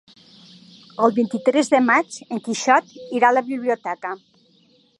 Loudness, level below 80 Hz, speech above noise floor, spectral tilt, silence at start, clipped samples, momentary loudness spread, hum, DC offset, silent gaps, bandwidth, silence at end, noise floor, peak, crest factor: -20 LUFS; -78 dBFS; 38 dB; -4 dB/octave; 1 s; under 0.1%; 12 LU; none; under 0.1%; none; 11.5 kHz; 0.85 s; -58 dBFS; -2 dBFS; 20 dB